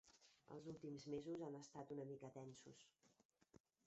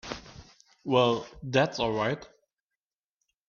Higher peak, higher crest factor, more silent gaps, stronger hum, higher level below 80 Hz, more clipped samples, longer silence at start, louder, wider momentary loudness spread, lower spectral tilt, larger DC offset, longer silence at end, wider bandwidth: second, -38 dBFS vs -8 dBFS; about the same, 18 dB vs 22 dB; first, 3.25-3.29 s vs none; neither; second, -86 dBFS vs -58 dBFS; neither; about the same, 0.05 s vs 0.05 s; second, -55 LUFS vs -28 LUFS; second, 12 LU vs 16 LU; first, -7 dB/octave vs -5.5 dB/octave; neither; second, 0.3 s vs 1.2 s; first, 8 kHz vs 7.2 kHz